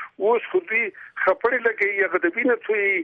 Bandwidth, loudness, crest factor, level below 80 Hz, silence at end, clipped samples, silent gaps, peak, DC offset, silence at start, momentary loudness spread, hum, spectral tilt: 5 kHz; -22 LUFS; 16 dB; -68 dBFS; 0 s; under 0.1%; none; -6 dBFS; under 0.1%; 0 s; 3 LU; none; -6.5 dB/octave